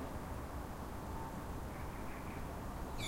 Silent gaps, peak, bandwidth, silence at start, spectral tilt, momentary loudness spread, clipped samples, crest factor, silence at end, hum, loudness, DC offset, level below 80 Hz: none; -30 dBFS; 16 kHz; 0 s; -5.5 dB/octave; 1 LU; under 0.1%; 14 dB; 0 s; none; -46 LUFS; under 0.1%; -48 dBFS